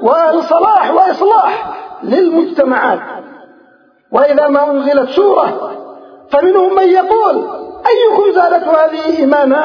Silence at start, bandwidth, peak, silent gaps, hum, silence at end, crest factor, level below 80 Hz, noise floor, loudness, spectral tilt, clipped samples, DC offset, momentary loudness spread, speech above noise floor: 0 s; 5.4 kHz; 0 dBFS; none; none; 0 s; 10 dB; -56 dBFS; -48 dBFS; -11 LUFS; -6 dB/octave; 0.1%; under 0.1%; 11 LU; 38 dB